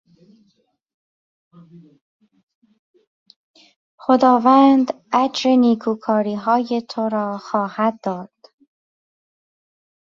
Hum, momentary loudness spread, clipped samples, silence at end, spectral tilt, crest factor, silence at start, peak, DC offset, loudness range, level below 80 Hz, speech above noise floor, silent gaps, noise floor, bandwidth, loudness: none; 11 LU; under 0.1%; 1.8 s; -6 dB/octave; 18 dB; 4.1 s; -2 dBFS; under 0.1%; 9 LU; -68 dBFS; 47 dB; none; -65 dBFS; 7.4 kHz; -18 LUFS